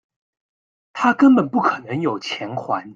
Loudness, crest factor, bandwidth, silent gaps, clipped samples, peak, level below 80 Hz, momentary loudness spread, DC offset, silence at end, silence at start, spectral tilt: -19 LUFS; 18 dB; 7.6 kHz; none; under 0.1%; -2 dBFS; -64 dBFS; 12 LU; under 0.1%; 0 s; 0.95 s; -6 dB/octave